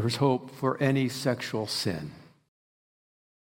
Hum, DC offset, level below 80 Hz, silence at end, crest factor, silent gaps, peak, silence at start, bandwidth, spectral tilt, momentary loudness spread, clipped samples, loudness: none; under 0.1%; -68 dBFS; 1.25 s; 18 dB; none; -12 dBFS; 0 s; 16.5 kHz; -5.5 dB/octave; 7 LU; under 0.1%; -28 LUFS